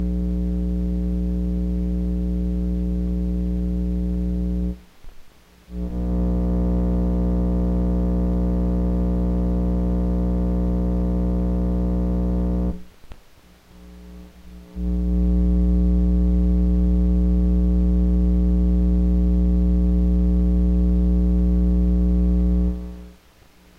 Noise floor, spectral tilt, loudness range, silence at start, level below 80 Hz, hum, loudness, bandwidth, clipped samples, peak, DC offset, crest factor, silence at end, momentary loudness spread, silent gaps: -51 dBFS; -11 dB/octave; 6 LU; 0 s; -22 dBFS; none; -22 LUFS; 2.5 kHz; under 0.1%; -12 dBFS; under 0.1%; 8 dB; 0.65 s; 5 LU; none